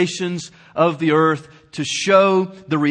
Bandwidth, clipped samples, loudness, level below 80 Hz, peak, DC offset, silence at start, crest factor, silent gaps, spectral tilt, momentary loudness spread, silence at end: 9.8 kHz; under 0.1%; -18 LUFS; -64 dBFS; -2 dBFS; under 0.1%; 0 s; 16 dB; none; -5 dB/octave; 15 LU; 0 s